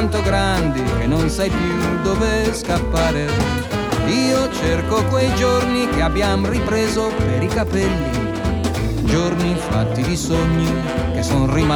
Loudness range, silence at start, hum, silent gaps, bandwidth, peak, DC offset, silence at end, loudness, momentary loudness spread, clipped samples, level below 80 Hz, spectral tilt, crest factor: 2 LU; 0 s; none; none; over 20 kHz; -6 dBFS; under 0.1%; 0 s; -18 LUFS; 4 LU; under 0.1%; -28 dBFS; -5.5 dB/octave; 12 dB